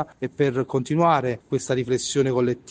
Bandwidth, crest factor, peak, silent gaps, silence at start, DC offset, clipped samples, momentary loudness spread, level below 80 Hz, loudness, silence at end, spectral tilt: 9.8 kHz; 16 dB; -6 dBFS; none; 0 s; under 0.1%; under 0.1%; 6 LU; -58 dBFS; -23 LUFS; 0 s; -5.5 dB/octave